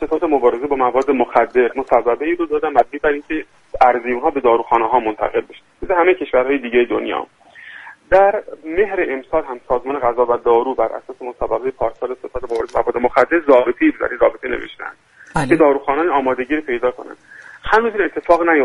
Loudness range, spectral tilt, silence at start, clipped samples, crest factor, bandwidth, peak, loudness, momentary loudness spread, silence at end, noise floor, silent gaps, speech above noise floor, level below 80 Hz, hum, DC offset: 3 LU; -6.5 dB/octave; 0 s; under 0.1%; 16 dB; 11.5 kHz; 0 dBFS; -17 LUFS; 12 LU; 0 s; -38 dBFS; none; 21 dB; -42 dBFS; none; under 0.1%